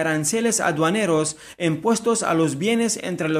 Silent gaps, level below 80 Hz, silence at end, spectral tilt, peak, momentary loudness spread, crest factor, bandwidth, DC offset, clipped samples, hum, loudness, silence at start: none; -62 dBFS; 0 s; -4 dB/octave; -6 dBFS; 5 LU; 14 dB; 14.5 kHz; under 0.1%; under 0.1%; none; -21 LUFS; 0 s